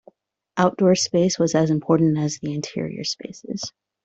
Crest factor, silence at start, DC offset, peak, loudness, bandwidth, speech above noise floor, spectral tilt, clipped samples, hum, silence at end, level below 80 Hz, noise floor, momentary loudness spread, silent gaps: 18 dB; 0.55 s; under 0.1%; -4 dBFS; -21 LUFS; 8.2 kHz; 33 dB; -5.5 dB/octave; under 0.1%; none; 0.35 s; -60 dBFS; -54 dBFS; 13 LU; none